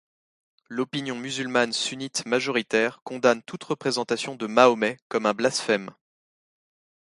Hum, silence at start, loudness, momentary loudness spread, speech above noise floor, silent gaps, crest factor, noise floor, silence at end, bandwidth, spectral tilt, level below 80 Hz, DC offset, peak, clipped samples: none; 0.7 s; -25 LUFS; 11 LU; over 65 dB; 3.02-3.06 s, 5.02-5.10 s; 22 dB; under -90 dBFS; 1.25 s; 11.5 kHz; -3.5 dB/octave; -72 dBFS; under 0.1%; -2 dBFS; under 0.1%